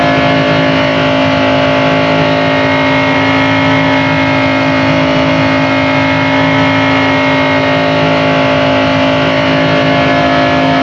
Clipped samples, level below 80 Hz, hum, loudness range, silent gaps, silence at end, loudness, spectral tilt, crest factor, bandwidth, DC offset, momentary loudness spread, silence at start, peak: under 0.1%; -40 dBFS; none; 0 LU; none; 0 s; -9 LUFS; -6 dB/octave; 10 dB; 7.6 kHz; under 0.1%; 1 LU; 0 s; 0 dBFS